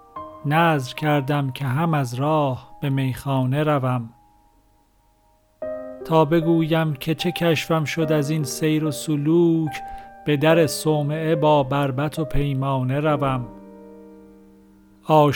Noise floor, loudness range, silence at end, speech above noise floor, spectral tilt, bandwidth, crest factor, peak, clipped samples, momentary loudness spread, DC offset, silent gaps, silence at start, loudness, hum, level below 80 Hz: -60 dBFS; 5 LU; 0 s; 39 dB; -6.5 dB/octave; 19 kHz; 18 dB; -4 dBFS; under 0.1%; 12 LU; under 0.1%; none; 0.15 s; -21 LUFS; none; -42 dBFS